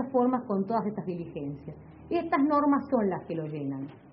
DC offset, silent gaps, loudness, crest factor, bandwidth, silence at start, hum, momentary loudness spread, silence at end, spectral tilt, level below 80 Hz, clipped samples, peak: under 0.1%; none; -29 LUFS; 16 dB; 5.4 kHz; 0 s; none; 14 LU; 0 s; -7.5 dB/octave; -62 dBFS; under 0.1%; -12 dBFS